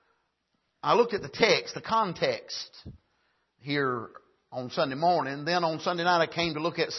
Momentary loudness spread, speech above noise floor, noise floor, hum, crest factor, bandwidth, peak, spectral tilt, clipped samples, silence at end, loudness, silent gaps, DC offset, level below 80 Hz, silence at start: 13 LU; 49 dB; -77 dBFS; none; 22 dB; 6.2 kHz; -8 dBFS; -4.5 dB/octave; under 0.1%; 0 s; -27 LUFS; none; under 0.1%; -64 dBFS; 0.85 s